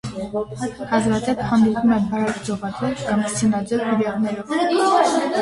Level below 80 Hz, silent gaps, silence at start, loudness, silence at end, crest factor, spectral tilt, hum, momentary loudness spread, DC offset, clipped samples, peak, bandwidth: -48 dBFS; none; 0.05 s; -20 LUFS; 0 s; 18 dB; -5.5 dB/octave; none; 10 LU; under 0.1%; under 0.1%; -2 dBFS; 11.5 kHz